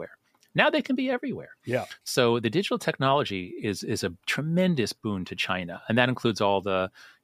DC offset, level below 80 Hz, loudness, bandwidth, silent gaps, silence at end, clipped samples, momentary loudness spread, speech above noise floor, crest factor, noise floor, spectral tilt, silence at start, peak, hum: under 0.1%; -66 dBFS; -27 LUFS; 15.5 kHz; none; 0.15 s; under 0.1%; 8 LU; 24 dB; 22 dB; -50 dBFS; -5 dB/octave; 0 s; -4 dBFS; none